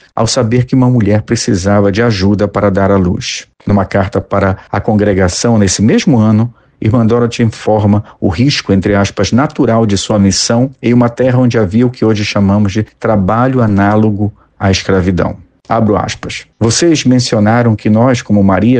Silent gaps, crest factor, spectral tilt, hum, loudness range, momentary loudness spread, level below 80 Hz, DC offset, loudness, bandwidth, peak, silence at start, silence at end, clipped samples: none; 10 dB; -6 dB/octave; none; 2 LU; 6 LU; -36 dBFS; under 0.1%; -11 LUFS; 9.6 kHz; 0 dBFS; 0.15 s; 0 s; under 0.1%